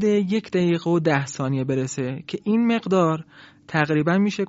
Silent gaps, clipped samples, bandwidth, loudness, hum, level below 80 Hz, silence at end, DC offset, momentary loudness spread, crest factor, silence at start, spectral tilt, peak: none; under 0.1%; 8 kHz; -22 LUFS; none; -62 dBFS; 0 s; under 0.1%; 7 LU; 18 dB; 0 s; -6 dB/octave; -4 dBFS